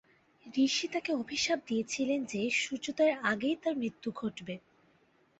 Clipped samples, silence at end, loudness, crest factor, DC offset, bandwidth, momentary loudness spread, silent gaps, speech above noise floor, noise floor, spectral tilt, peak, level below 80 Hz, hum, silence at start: under 0.1%; 0.8 s; -32 LUFS; 20 dB; under 0.1%; 8.2 kHz; 9 LU; none; 36 dB; -68 dBFS; -3 dB/octave; -14 dBFS; -72 dBFS; none; 0.45 s